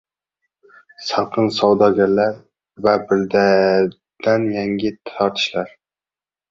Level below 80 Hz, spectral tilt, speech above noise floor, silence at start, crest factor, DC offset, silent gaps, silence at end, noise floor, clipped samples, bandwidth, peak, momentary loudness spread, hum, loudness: -56 dBFS; -6 dB/octave; over 73 dB; 1 s; 18 dB; under 0.1%; none; 0.85 s; under -90 dBFS; under 0.1%; 7.6 kHz; 0 dBFS; 10 LU; none; -18 LUFS